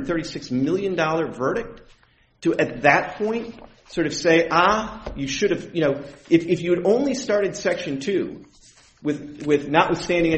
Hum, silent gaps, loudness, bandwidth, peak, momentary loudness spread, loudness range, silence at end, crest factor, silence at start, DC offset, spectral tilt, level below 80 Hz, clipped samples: none; none; -22 LUFS; 8.4 kHz; 0 dBFS; 12 LU; 3 LU; 0 s; 22 dB; 0 s; under 0.1%; -5 dB/octave; -48 dBFS; under 0.1%